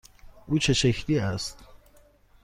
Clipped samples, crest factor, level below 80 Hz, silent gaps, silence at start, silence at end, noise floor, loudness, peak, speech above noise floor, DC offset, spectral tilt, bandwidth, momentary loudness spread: under 0.1%; 16 dB; -46 dBFS; none; 0.25 s; 0.7 s; -57 dBFS; -26 LUFS; -12 dBFS; 32 dB; under 0.1%; -4.5 dB/octave; 15.5 kHz; 11 LU